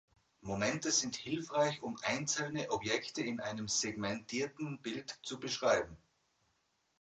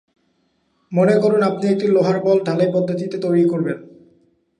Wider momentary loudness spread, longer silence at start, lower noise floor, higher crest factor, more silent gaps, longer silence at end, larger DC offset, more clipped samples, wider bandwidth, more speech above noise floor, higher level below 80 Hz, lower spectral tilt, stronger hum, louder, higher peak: about the same, 10 LU vs 8 LU; second, 0.45 s vs 0.9 s; first, -79 dBFS vs -65 dBFS; first, 20 dB vs 14 dB; neither; first, 1.05 s vs 0.75 s; neither; neither; second, 9.4 kHz vs 10.5 kHz; second, 42 dB vs 48 dB; about the same, -68 dBFS vs -68 dBFS; second, -3 dB/octave vs -8 dB/octave; neither; second, -36 LUFS vs -18 LUFS; second, -18 dBFS vs -4 dBFS